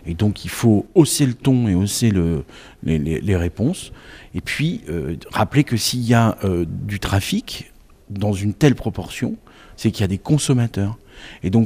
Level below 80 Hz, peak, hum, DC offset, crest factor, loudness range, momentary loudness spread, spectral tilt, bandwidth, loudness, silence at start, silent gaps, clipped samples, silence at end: -40 dBFS; 0 dBFS; none; under 0.1%; 18 dB; 4 LU; 13 LU; -5.5 dB/octave; 16 kHz; -20 LUFS; 0.05 s; none; under 0.1%; 0 s